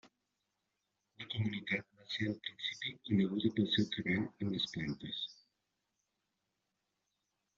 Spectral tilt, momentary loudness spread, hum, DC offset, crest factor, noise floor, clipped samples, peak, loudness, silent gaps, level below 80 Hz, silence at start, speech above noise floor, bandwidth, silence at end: -4.5 dB/octave; 9 LU; none; under 0.1%; 20 dB; -86 dBFS; under 0.1%; -18 dBFS; -37 LUFS; none; -72 dBFS; 0.05 s; 49 dB; 7.4 kHz; 2.25 s